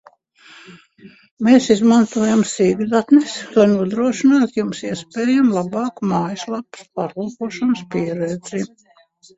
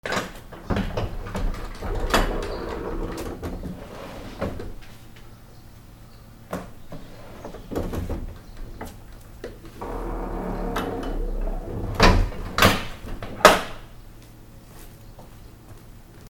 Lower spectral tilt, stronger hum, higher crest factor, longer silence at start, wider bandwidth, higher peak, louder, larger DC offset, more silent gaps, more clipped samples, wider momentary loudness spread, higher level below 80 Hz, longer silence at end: about the same, -5.5 dB/octave vs -4.5 dB/octave; neither; second, 18 dB vs 26 dB; first, 0.7 s vs 0.05 s; second, 8 kHz vs 19 kHz; about the same, 0 dBFS vs 0 dBFS; first, -18 LUFS vs -25 LUFS; neither; first, 1.31-1.37 s vs none; neither; second, 13 LU vs 28 LU; second, -58 dBFS vs -32 dBFS; first, 0.7 s vs 0 s